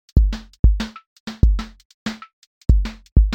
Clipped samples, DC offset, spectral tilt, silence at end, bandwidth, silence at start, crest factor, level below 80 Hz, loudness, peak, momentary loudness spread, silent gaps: under 0.1%; under 0.1%; -7 dB/octave; 0 s; 7.4 kHz; 0.15 s; 18 dB; -20 dBFS; -22 LUFS; 0 dBFS; 17 LU; 0.59-0.63 s, 1.06-1.27 s, 1.85-2.06 s, 2.33-2.61 s, 3.12-3.16 s